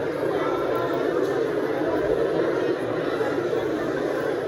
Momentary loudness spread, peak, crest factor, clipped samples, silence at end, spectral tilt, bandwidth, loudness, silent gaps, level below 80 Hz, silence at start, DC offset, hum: 2 LU; -10 dBFS; 14 dB; under 0.1%; 0 s; -6.5 dB/octave; 16.5 kHz; -25 LUFS; none; -54 dBFS; 0 s; under 0.1%; none